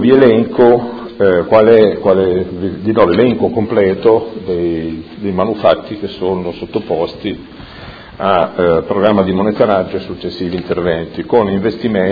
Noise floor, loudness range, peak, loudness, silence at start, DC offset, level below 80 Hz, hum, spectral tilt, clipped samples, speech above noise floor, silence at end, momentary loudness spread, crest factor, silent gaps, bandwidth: -32 dBFS; 6 LU; 0 dBFS; -13 LUFS; 0 s; under 0.1%; -42 dBFS; none; -9.5 dB/octave; 0.2%; 20 dB; 0 s; 13 LU; 12 dB; none; 5 kHz